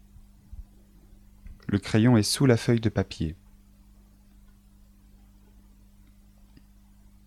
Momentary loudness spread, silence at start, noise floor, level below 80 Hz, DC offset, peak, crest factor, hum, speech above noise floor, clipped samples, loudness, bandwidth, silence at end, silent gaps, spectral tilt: 28 LU; 0.5 s; -55 dBFS; -50 dBFS; under 0.1%; -6 dBFS; 22 dB; 50 Hz at -50 dBFS; 32 dB; under 0.1%; -24 LUFS; 14.5 kHz; 3.9 s; none; -6 dB/octave